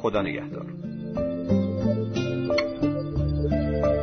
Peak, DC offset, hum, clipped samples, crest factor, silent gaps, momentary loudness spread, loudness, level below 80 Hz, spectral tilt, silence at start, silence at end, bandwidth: -10 dBFS; 0.2%; none; under 0.1%; 16 dB; none; 10 LU; -27 LUFS; -38 dBFS; -8 dB/octave; 0 s; 0 s; 6.4 kHz